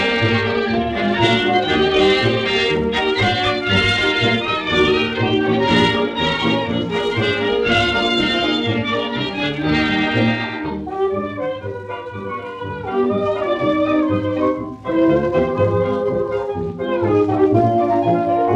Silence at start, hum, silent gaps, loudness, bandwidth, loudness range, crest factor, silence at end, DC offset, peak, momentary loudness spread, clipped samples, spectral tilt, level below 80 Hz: 0 s; none; none; -17 LUFS; 10 kHz; 5 LU; 14 dB; 0 s; under 0.1%; -2 dBFS; 9 LU; under 0.1%; -6 dB/octave; -42 dBFS